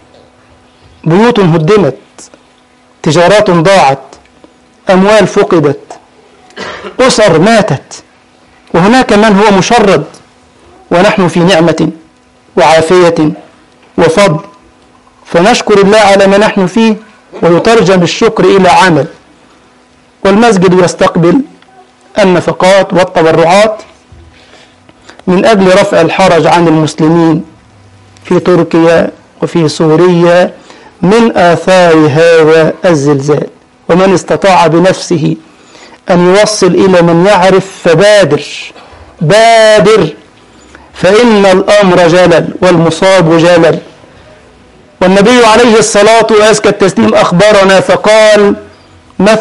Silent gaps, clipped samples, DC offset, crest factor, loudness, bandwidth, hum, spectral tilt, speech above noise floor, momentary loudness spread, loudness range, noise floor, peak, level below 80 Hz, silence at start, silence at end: none; 0.3%; under 0.1%; 6 dB; -6 LUFS; 11.5 kHz; none; -5.5 dB/octave; 38 dB; 10 LU; 4 LU; -43 dBFS; 0 dBFS; -40 dBFS; 1.05 s; 0 s